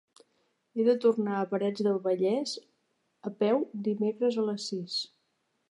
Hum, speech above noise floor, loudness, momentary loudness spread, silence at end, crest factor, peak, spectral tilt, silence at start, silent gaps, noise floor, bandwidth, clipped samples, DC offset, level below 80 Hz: none; 48 dB; -29 LUFS; 12 LU; 0.65 s; 18 dB; -12 dBFS; -5.5 dB/octave; 0.75 s; none; -77 dBFS; 11 kHz; under 0.1%; under 0.1%; -86 dBFS